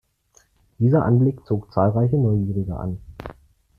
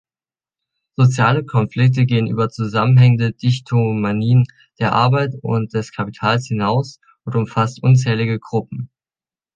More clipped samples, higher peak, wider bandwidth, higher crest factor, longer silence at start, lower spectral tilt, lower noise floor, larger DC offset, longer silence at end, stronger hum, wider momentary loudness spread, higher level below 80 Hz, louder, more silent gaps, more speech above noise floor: neither; about the same, -4 dBFS vs -2 dBFS; second, 6.6 kHz vs 7.6 kHz; about the same, 18 dB vs 16 dB; second, 0.8 s vs 1 s; first, -11 dB/octave vs -7.5 dB/octave; second, -60 dBFS vs under -90 dBFS; neither; second, 0.45 s vs 0.7 s; neither; first, 18 LU vs 10 LU; first, -46 dBFS vs -54 dBFS; second, -21 LUFS vs -17 LUFS; neither; second, 40 dB vs over 74 dB